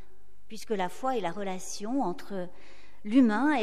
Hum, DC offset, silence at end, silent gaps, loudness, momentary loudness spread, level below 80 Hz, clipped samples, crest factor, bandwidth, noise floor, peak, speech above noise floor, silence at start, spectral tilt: none; 2%; 0 s; none; -30 LUFS; 20 LU; -64 dBFS; under 0.1%; 18 dB; 13.5 kHz; -62 dBFS; -12 dBFS; 33 dB; 0.5 s; -5 dB/octave